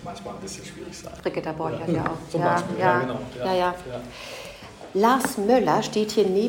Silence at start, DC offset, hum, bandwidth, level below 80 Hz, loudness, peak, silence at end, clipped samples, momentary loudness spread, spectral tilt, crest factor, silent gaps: 0 s; under 0.1%; none; 17 kHz; -54 dBFS; -24 LUFS; -6 dBFS; 0 s; under 0.1%; 16 LU; -5 dB/octave; 18 dB; none